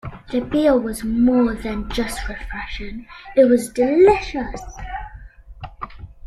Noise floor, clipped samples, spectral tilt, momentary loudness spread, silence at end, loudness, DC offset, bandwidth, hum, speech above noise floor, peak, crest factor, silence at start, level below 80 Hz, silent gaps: -39 dBFS; under 0.1%; -5.5 dB/octave; 20 LU; 0.2 s; -19 LUFS; under 0.1%; 13 kHz; none; 21 dB; -2 dBFS; 18 dB; 0.05 s; -36 dBFS; none